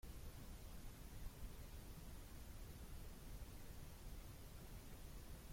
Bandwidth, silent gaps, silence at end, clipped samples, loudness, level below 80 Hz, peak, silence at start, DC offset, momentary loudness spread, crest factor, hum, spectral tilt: 16.5 kHz; none; 0 s; under 0.1%; -58 LUFS; -56 dBFS; -40 dBFS; 0.05 s; under 0.1%; 1 LU; 14 dB; none; -4.5 dB/octave